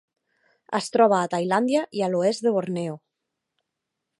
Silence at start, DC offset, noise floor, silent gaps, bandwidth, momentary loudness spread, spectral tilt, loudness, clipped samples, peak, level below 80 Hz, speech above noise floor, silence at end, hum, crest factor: 0.7 s; under 0.1%; -83 dBFS; none; 11.5 kHz; 11 LU; -5.5 dB/octave; -23 LUFS; under 0.1%; -4 dBFS; -76 dBFS; 60 dB; 1.25 s; none; 20 dB